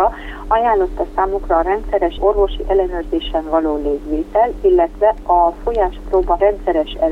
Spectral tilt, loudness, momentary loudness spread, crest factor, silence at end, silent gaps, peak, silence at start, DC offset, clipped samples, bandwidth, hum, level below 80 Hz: -7.5 dB/octave; -17 LUFS; 6 LU; 14 dB; 0 s; none; -2 dBFS; 0 s; under 0.1%; under 0.1%; 6.2 kHz; 50 Hz at -50 dBFS; -28 dBFS